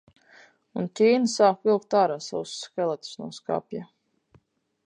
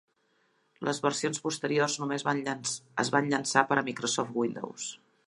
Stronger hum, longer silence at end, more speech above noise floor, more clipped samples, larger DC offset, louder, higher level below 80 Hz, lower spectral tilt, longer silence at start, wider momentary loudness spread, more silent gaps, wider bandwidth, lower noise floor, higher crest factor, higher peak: neither; first, 1 s vs 0.35 s; about the same, 39 dB vs 42 dB; neither; neither; first, -25 LUFS vs -30 LUFS; about the same, -74 dBFS vs -78 dBFS; first, -5 dB/octave vs -3.5 dB/octave; about the same, 0.75 s vs 0.8 s; first, 16 LU vs 10 LU; neither; second, 10 kHz vs 11.5 kHz; second, -64 dBFS vs -71 dBFS; second, 20 dB vs 26 dB; about the same, -6 dBFS vs -6 dBFS